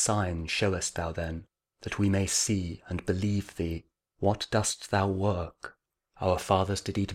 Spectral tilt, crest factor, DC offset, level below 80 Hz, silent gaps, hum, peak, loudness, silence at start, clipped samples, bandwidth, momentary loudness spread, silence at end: -4.5 dB/octave; 20 dB; under 0.1%; -48 dBFS; none; none; -10 dBFS; -29 LUFS; 0 s; under 0.1%; 15.5 kHz; 11 LU; 0 s